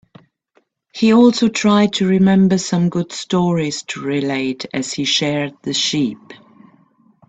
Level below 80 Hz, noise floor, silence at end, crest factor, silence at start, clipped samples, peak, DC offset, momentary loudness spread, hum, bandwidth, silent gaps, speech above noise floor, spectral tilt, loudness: -56 dBFS; -61 dBFS; 0.95 s; 16 dB; 0.95 s; under 0.1%; 0 dBFS; under 0.1%; 11 LU; none; 8.4 kHz; none; 45 dB; -5 dB/octave; -16 LUFS